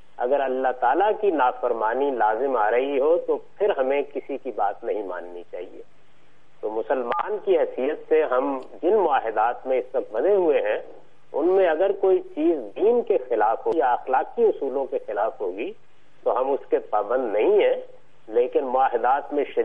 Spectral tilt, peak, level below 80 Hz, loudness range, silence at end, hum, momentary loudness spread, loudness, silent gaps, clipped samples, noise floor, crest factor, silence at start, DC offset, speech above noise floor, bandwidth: -7 dB/octave; -8 dBFS; -70 dBFS; 6 LU; 0 s; none; 10 LU; -23 LUFS; none; under 0.1%; -60 dBFS; 16 dB; 0.2 s; 0.9%; 37 dB; 3.9 kHz